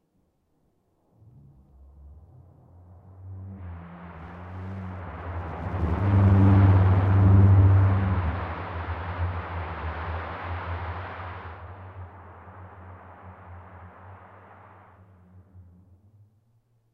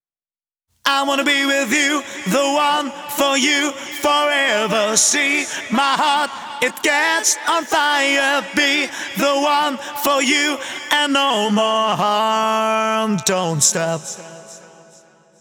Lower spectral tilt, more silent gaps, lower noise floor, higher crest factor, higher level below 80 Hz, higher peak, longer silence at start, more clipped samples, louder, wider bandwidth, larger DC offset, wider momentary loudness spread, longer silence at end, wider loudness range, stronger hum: first, -10.5 dB/octave vs -2 dB/octave; neither; second, -70 dBFS vs under -90 dBFS; about the same, 18 dB vs 18 dB; first, -40 dBFS vs -64 dBFS; second, -8 dBFS vs 0 dBFS; first, 2.05 s vs 0.85 s; neither; second, -24 LUFS vs -17 LUFS; second, 3.9 kHz vs over 20 kHz; neither; first, 28 LU vs 7 LU; first, 1.3 s vs 0.75 s; first, 25 LU vs 2 LU; neither